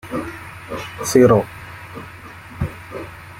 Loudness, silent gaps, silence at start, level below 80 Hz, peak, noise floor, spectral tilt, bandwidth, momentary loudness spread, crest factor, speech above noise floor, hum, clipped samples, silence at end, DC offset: -18 LUFS; none; 0.05 s; -46 dBFS; -2 dBFS; -38 dBFS; -6 dB/octave; 16.5 kHz; 22 LU; 20 dB; 21 dB; none; under 0.1%; 0 s; under 0.1%